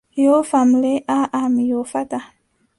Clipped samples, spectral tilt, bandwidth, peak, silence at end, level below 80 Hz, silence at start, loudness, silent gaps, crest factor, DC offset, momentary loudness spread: under 0.1%; -5 dB/octave; 11.5 kHz; -4 dBFS; 0.55 s; -62 dBFS; 0.15 s; -18 LUFS; none; 14 dB; under 0.1%; 10 LU